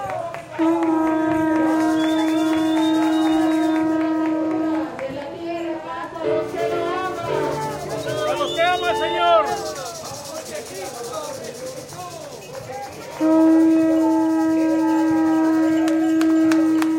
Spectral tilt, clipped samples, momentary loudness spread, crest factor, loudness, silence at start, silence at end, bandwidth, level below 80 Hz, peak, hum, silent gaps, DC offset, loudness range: -5 dB/octave; under 0.1%; 14 LU; 16 dB; -20 LUFS; 0 s; 0 s; 16 kHz; -58 dBFS; -4 dBFS; none; none; under 0.1%; 7 LU